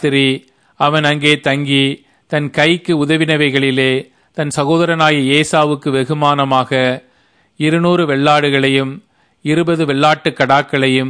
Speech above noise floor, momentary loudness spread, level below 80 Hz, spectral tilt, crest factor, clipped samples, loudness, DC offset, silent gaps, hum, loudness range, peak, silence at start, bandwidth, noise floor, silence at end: 42 dB; 8 LU; -56 dBFS; -5.5 dB/octave; 14 dB; under 0.1%; -13 LUFS; under 0.1%; none; none; 1 LU; 0 dBFS; 0 s; 11 kHz; -55 dBFS; 0 s